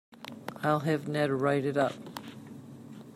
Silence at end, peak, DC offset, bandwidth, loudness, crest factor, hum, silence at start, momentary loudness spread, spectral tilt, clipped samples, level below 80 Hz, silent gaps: 0 s; -14 dBFS; under 0.1%; 15.5 kHz; -29 LUFS; 18 dB; none; 0.1 s; 19 LU; -6.5 dB/octave; under 0.1%; -74 dBFS; none